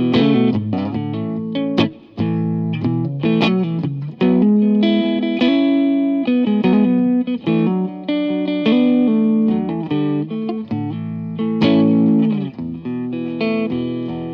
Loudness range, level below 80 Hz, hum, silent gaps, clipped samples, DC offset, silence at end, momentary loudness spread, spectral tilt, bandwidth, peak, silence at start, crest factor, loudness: 3 LU; -58 dBFS; none; none; under 0.1%; under 0.1%; 0 s; 10 LU; -9 dB/octave; 6 kHz; -2 dBFS; 0 s; 14 dB; -18 LUFS